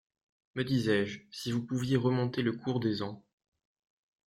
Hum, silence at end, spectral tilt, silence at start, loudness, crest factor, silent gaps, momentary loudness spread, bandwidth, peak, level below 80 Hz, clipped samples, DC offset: none; 1.1 s; -6.5 dB/octave; 0.55 s; -32 LUFS; 18 dB; none; 11 LU; 14 kHz; -16 dBFS; -66 dBFS; under 0.1%; under 0.1%